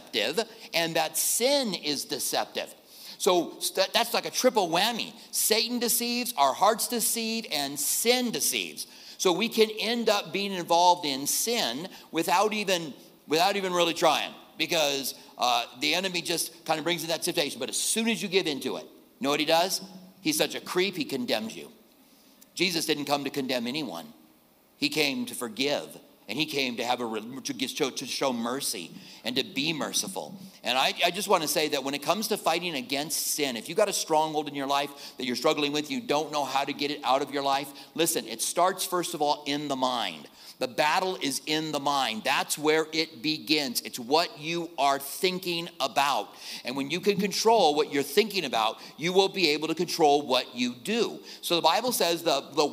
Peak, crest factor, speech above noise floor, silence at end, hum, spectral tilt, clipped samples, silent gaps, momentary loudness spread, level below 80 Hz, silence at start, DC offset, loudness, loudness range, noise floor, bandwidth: -8 dBFS; 20 dB; 33 dB; 0 s; none; -2.5 dB/octave; under 0.1%; none; 9 LU; -78 dBFS; 0 s; under 0.1%; -27 LUFS; 5 LU; -60 dBFS; 16 kHz